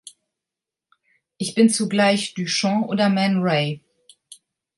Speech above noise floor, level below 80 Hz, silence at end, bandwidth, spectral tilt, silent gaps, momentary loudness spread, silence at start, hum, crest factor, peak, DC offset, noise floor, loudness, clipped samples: 68 dB; -70 dBFS; 0.45 s; 11.5 kHz; -4.5 dB/octave; none; 9 LU; 1.4 s; none; 18 dB; -6 dBFS; under 0.1%; -87 dBFS; -20 LUFS; under 0.1%